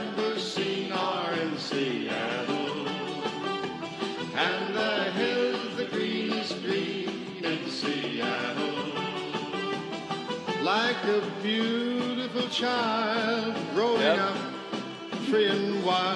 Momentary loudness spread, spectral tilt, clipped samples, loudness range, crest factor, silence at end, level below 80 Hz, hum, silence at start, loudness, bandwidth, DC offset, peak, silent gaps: 8 LU; -4.5 dB/octave; under 0.1%; 4 LU; 18 dB; 0 s; -78 dBFS; none; 0 s; -29 LUFS; 11.5 kHz; under 0.1%; -10 dBFS; none